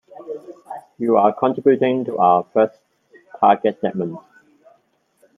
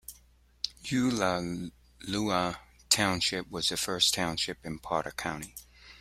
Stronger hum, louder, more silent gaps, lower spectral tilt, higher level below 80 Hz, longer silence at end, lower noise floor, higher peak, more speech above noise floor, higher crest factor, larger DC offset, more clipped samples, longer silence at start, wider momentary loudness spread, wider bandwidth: second, none vs 60 Hz at -55 dBFS; first, -18 LUFS vs -30 LUFS; neither; first, -8.5 dB/octave vs -3 dB/octave; second, -70 dBFS vs -56 dBFS; first, 1.2 s vs 0.05 s; about the same, -62 dBFS vs -61 dBFS; first, -2 dBFS vs -8 dBFS; first, 45 dB vs 31 dB; second, 18 dB vs 24 dB; neither; neither; about the same, 0.2 s vs 0.1 s; about the same, 19 LU vs 18 LU; second, 3.8 kHz vs 16 kHz